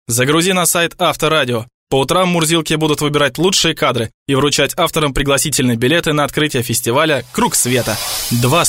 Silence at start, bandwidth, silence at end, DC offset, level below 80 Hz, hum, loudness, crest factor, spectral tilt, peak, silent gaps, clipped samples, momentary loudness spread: 0.1 s; 16.5 kHz; 0 s; under 0.1%; -38 dBFS; none; -14 LUFS; 14 dB; -3.5 dB/octave; -2 dBFS; 1.74-1.87 s, 4.14-4.26 s; under 0.1%; 4 LU